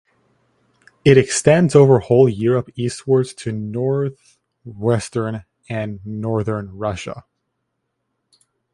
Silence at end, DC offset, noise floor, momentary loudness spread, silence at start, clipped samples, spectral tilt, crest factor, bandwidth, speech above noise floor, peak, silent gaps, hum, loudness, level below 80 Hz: 1.55 s; under 0.1%; -74 dBFS; 14 LU; 1.05 s; under 0.1%; -6 dB/octave; 18 dB; 11.5 kHz; 57 dB; 0 dBFS; none; none; -18 LUFS; -48 dBFS